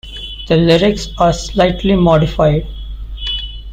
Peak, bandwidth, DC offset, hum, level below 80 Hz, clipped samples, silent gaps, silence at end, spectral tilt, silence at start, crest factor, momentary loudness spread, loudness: -2 dBFS; 9.4 kHz; under 0.1%; none; -26 dBFS; under 0.1%; none; 0 s; -6 dB/octave; 0.05 s; 12 dB; 16 LU; -14 LUFS